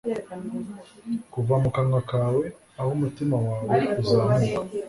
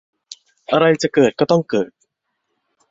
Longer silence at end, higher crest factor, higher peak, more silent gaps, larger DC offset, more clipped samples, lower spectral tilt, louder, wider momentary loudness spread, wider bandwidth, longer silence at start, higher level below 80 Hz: second, 0 s vs 1.05 s; about the same, 16 dB vs 18 dB; second, -8 dBFS vs -2 dBFS; neither; neither; neither; first, -8 dB/octave vs -5.5 dB/octave; second, -25 LUFS vs -17 LUFS; about the same, 12 LU vs 11 LU; first, 11.5 kHz vs 7.8 kHz; second, 0.05 s vs 0.3 s; first, -52 dBFS vs -58 dBFS